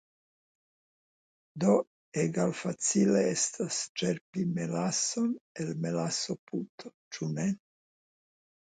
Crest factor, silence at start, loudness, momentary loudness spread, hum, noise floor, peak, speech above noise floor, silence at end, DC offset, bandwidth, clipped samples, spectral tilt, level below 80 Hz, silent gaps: 20 dB; 1.55 s; -31 LUFS; 12 LU; none; under -90 dBFS; -12 dBFS; over 60 dB; 1.2 s; under 0.1%; 9.6 kHz; under 0.1%; -4.5 dB/octave; -74 dBFS; 1.87-2.12 s, 3.89-3.95 s, 4.21-4.33 s, 5.41-5.55 s, 6.39-6.47 s, 6.69-6.78 s, 6.94-7.11 s